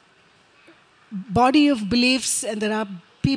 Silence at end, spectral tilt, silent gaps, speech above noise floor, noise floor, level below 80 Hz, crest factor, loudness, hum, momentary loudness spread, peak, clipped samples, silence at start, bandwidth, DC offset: 0 s; -4 dB/octave; none; 36 dB; -56 dBFS; -50 dBFS; 16 dB; -20 LUFS; none; 16 LU; -6 dBFS; under 0.1%; 1.1 s; 10.5 kHz; under 0.1%